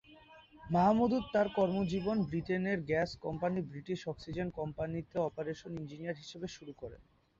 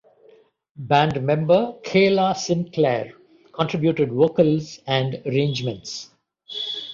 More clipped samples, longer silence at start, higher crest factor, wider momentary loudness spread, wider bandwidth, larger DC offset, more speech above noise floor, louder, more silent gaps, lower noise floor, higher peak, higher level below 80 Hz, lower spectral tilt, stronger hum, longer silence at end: neither; second, 0.1 s vs 0.8 s; about the same, 18 dB vs 18 dB; about the same, 14 LU vs 14 LU; about the same, 7.6 kHz vs 7.6 kHz; neither; second, 24 dB vs 34 dB; second, -35 LUFS vs -21 LUFS; neither; first, -59 dBFS vs -55 dBFS; second, -18 dBFS vs -4 dBFS; about the same, -60 dBFS vs -60 dBFS; about the same, -6 dB/octave vs -6 dB/octave; neither; first, 0.4 s vs 0 s